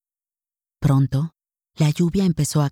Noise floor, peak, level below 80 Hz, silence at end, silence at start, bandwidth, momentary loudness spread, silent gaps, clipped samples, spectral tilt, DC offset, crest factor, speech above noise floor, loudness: under -90 dBFS; -6 dBFS; -44 dBFS; 0 s; 0.8 s; 16 kHz; 6 LU; none; under 0.1%; -6.5 dB/octave; under 0.1%; 16 dB; over 71 dB; -21 LUFS